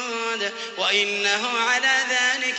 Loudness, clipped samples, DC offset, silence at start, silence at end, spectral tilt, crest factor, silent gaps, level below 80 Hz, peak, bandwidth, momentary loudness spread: -21 LUFS; under 0.1%; under 0.1%; 0 s; 0 s; 0 dB/octave; 16 dB; none; -80 dBFS; -6 dBFS; 8.4 kHz; 7 LU